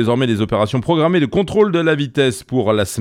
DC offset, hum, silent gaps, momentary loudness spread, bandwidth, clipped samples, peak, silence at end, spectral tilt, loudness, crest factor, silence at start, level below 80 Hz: under 0.1%; none; none; 3 LU; 16 kHz; under 0.1%; -2 dBFS; 0 s; -6 dB/octave; -16 LUFS; 14 dB; 0 s; -46 dBFS